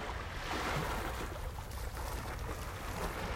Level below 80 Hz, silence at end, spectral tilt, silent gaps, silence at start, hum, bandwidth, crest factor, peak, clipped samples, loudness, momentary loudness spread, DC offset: -44 dBFS; 0 s; -4.5 dB/octave; none; 0 s; none; 16 kHz; 16 dB; -24 dBFS; under 0.1%; -40 LUFS; 7 LU; under 0.1%